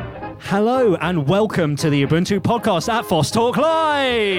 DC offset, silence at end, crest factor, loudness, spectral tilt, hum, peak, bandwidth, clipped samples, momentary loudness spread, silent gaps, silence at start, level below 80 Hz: under 0.1%; 0 s; 14 dB; -18 LUFS; -5.5 dB/octave; none; -4 dBFS; 16.5 kHz; under 0.1%; 3 LU; none; 0 s; -46 dBFS